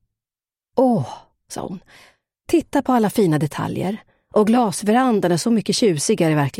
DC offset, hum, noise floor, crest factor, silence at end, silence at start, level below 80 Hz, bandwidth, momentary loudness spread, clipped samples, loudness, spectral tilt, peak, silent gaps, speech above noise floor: under 0.1%; none; under -90 dBFS; 16 dB; 0 s; 0.75 s; -56 dBFS; 16.5 kHz; 15 LU; under 0.1%; -19 LUFS; -5.5 dB/octave; -4 dBFS; none; over 72 dB